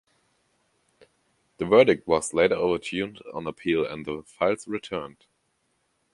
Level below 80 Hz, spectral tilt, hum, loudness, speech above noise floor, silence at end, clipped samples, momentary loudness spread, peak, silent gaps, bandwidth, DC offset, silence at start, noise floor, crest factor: -58 dBFS; -4.5 dB/octave; none; -25 LUFS; 48 dB; 1.05 s; under 0.1%; 16 LU; -4 dBFS; none; 11.5 kHz; under 0.1%; 1.6 s; -72 dBFS; 24 dB